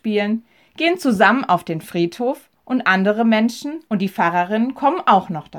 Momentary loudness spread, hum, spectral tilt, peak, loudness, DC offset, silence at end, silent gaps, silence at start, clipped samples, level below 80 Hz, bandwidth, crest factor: 10 LU; none; -6 dB/octave; -2 dBFS; -18 LUFS; under 0.1%; 0 s; none; 0.05 s; under 0.1%; -64 dBFS; 18 kHz; 18 dB